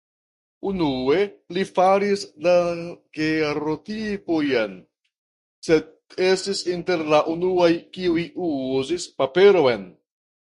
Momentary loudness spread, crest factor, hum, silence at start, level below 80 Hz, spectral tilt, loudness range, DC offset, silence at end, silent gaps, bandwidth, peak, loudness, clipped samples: 10 LU; 18 dB; none; 0.65 s; -56 dBFS; -5 dB/octave; 4 LU; under 0.1%; 0.5 s; 5.18-5.62 s; 11.5 kHz; -4 dBFS; -22 LUFS; under 0.1%